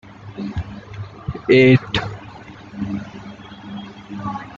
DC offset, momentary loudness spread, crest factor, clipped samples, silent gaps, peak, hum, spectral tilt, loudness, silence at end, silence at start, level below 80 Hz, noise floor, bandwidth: under 0.1%; 24 LU; 18 dB; under 0.1%; none; -2 dBFS; none; -7.5 dB/octave; -19 LUFS; 0 s; 0.05 s; -44 dBFS; -38 dBFS; 7.4 kHz